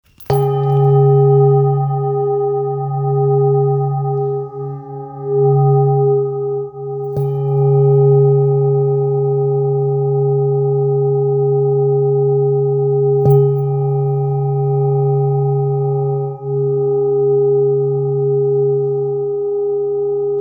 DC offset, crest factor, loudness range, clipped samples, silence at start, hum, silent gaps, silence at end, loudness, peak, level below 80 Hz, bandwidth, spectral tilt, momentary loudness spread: under 0.1%; 12 dB; 3 LU; under 0.1%; 0.2 s; none; none; 0 s; -15 LUFS; -2 dBFS; -56 dBFS; over 20 kHz; -11.5 dB/octave; 8 LU